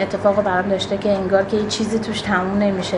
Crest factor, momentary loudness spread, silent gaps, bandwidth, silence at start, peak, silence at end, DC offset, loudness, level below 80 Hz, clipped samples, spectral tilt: 16 dB; 3 LU; none; 11 kHz; 0 s; -2 dBFS; 0 s; under 0.1%; -19 LUFS; -44 dBFS; under 0.1%; -5 dB/octave